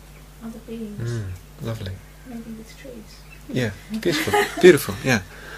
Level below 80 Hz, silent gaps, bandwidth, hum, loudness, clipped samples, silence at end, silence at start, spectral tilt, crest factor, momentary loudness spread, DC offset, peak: -46 dBFS; none; 15.5 kHz; none; -21 LUFS; under 0.1%; 0 s; 0 s; -5 dB/octave; 24 dB; 25 LU; under 0.1%; 0 dBFS